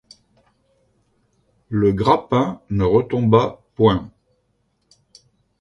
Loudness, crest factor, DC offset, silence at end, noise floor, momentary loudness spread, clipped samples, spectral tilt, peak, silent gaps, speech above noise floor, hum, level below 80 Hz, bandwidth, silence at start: -18 LUFS; 20 dB; under 0.1%; 1.5 s; -67 dBFS; 8 LU; under 0.1%; -8.5 dB/octave; -2 dBFS; none; 50 dB; none; -44 dBFS; 11 kHz; 1.7 s